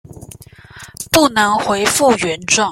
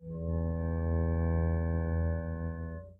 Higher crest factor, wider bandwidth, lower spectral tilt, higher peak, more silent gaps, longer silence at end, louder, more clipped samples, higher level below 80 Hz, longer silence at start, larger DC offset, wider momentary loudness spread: about the same, 16 dB vs 12 dB; first, 16.5 kHz vs 2.4 kHz; second, -2.5 dB/octave vs -13 dB/octave; first, 0 dBFS vs -20 dBFS; neither; about the same, 0 s vs 0.05 s; first, -14 LUFS vs -33 LUFS; neither; second, -46 dBFS vs -38 dBFS; first, 0.15 s vs 0 s; neither; about the same, 9 LU vs 7 LU